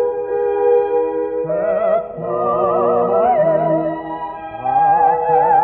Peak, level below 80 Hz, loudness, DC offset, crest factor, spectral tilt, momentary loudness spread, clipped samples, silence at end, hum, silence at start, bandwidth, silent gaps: -4 dBFS; -52 dBFS; -17 LUFS; under 0.1%; 12 dB; -6.5 dB/octave; 9 LU; under 0.1%; 0 s; none; 0 s; 3.9 kHz; none